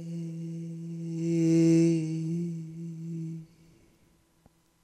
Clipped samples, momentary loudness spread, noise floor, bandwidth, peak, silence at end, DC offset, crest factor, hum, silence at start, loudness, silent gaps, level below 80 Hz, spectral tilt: under 0.1%; 17 LU; -65 dBFS; 10 kHz; -14 dBFS; 1.4 s; under 0.1%; 16 dB; none; 0 s; -29 LUFS; none; -76 dBFS; -8 dB/octave